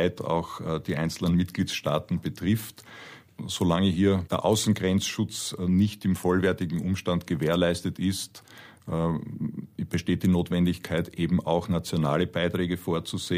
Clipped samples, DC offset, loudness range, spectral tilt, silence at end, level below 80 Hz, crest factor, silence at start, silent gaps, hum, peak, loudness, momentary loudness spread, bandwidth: under 0.1%; under 0.1%; 3 LU; -6 dB/octave; 0 s; -52 dBFS; 18 dB; 0 s; none; none; -10 dBFS; -27 LUFS; 10 LU; 15.5 kHz